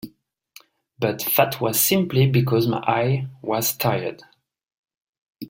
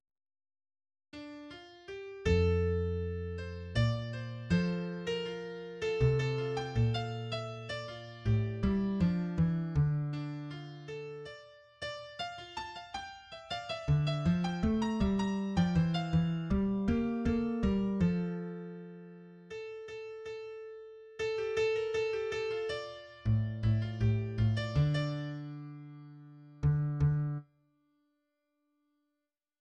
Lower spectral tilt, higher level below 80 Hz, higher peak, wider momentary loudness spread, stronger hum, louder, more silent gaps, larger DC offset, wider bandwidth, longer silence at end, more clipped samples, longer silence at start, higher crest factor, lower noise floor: second, -5 dB/octave vs -7.5 dB/octave; second, -58 dBFS vs -48 dBFS; first, -2 dBFS vs -18 dBFS; second, 8 LU vs 16 LU; neither; first, -21 LUFS vs -34 LUFS; first, 4.78-4.84 s, 4.97-5.35 s vs none; neither; first, 17 kHz vs 9.2 kHz; second, 0 s vs 2.2 s; neither; second, 0.05 s vs 1.15 s; about the same, 20 dB vs 16 dB; second, -55 dBFS vs -87 dBFS